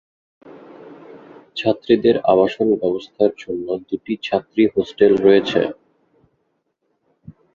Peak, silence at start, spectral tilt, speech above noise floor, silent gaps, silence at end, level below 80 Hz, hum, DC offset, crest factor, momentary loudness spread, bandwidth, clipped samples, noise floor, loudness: -2 dBFS; 0.5 s; -7 dB/octave; 52 dB; none; 1.8 s; -56 dBFS; none; under 0.1%; 18 dB; 11 LU; 7.2 kHz; under 0.1%; -70 dBFS; -18 LUFS